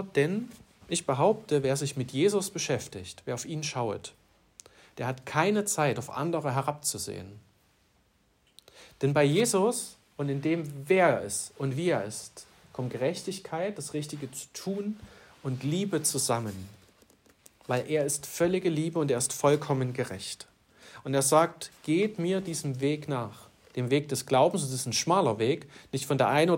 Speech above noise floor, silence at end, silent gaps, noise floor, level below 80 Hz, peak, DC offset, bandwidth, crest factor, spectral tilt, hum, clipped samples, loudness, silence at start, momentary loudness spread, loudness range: 39 dB; 0 s; none; -68 dBFS; -68 dBFS; -10 dBFS; under 0.1%; 16 kHz; 20 dB; -4.5 dB/octave; none; under 0.1%; -29 LUFS; 0 s; 14 LU; 5 LU